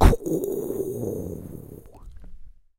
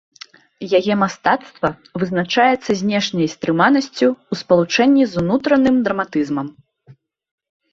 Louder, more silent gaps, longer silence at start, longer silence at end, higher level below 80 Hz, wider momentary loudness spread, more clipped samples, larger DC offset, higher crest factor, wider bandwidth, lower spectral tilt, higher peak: second, -28 LUFS vs -17 LUFS; neither; second, 0 s vs 0.6 s; second, 0.3 s vs 0.8 s; first, -28 dBFS vs -56 dBFS; first, 22 LU vs 9 LU; neither; neither; first, 24 dB vs 16 dB; first, 17 kHz vs 7.6 kHz; first, -7 dB/octave vs -5.5 dB/octave; about the same, 0 dBFS vs -2 dBFS